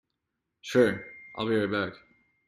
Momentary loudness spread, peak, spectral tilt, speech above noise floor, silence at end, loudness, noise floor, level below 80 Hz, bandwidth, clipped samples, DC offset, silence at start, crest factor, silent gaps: 16 LU; -10 dBFS; -6 dB/octave; 57 dB; 0.5 s; -28 LUFS; -83 dBFS; -66 dBFS; 14 kHz; under 0.1%; under 0.1%; 0.65 s; 20 dB; none